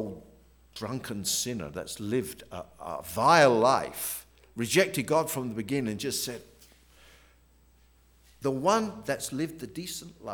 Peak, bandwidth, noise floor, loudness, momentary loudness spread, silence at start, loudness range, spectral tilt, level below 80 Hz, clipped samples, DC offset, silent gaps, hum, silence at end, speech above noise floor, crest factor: -6 dBFS; over 20 kHz; -61 dBFS; -28 LUFS; 17 LU; 0 s; 8 LU; -4 dB/octave; -60 dBFS; under 0.1%; under 0.1%; none; none; 0 s; 32 dB; 24 dB